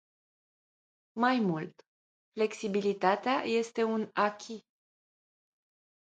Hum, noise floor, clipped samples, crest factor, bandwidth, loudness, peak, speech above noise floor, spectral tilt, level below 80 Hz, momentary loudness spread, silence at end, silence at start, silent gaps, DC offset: none; under -90 dBFS; under 0.1%; 22 dB; 9.2 kHz; -31 LUFS; -12 dBFS; over 60 dB; -5.5 dB/octave; -82 dBFS; 17 LU; 1.5 s; 1.15 s; 1.88-2.32 s; under 0.1%